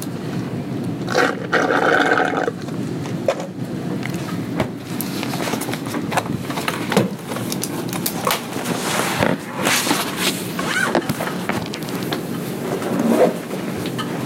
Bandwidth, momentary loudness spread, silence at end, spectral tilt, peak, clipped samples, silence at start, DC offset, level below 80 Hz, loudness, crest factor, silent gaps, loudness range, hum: 17 kHz; 9 LU; 0 s; -4 dB/octave; -4 dBFS; under 0.1%; 0 s; under 0.1%; -54 dBFS; -21 LUFS; 18 dB; none; 4 LU; none